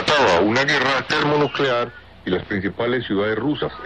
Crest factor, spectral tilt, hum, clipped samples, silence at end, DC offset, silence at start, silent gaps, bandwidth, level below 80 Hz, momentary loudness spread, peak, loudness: 12 dB; -5 dB/octave; none; under 0.1%; 0 s; 0.2%; 0 s; none; 10 kHz; -50 dBFS; 9 LU; -8 dBFS; -19 LUFS